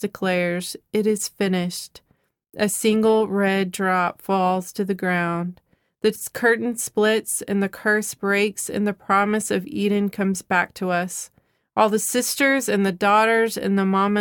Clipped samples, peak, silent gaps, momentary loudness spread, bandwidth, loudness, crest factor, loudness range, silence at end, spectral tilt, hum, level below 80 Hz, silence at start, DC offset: under 0.1%; -4 dBFS; none; 7 LU; 19 kHz; -21 LUFS; 18 dB; 2 LU; 0 s; -4.5 dB/octave; none; -64 dBFS; 0 s; under 0.1%